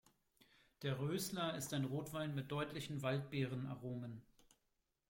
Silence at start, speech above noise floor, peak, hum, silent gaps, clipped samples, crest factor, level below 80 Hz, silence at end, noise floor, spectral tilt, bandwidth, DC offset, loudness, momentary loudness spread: 0.8 s; 43 dB; -28 dBFS; none; none; under 0.1%; 16 dB; -74 dBFS; 0.9 s; -86 dBFS; -5.5 dB/octave; 16.5 kHz; under 0.1%; -43 LUFS; 7 LU